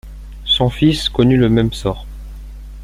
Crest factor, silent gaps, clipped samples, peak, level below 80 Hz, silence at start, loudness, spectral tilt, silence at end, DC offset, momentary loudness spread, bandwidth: 16 dB; none; under 0.1%; -2 dBFS; -30 dBFS; 0.05 s; -15 LUFS; -6.5 dB/octave; 0 s; under 0.1%; 22 LU; 15 kHz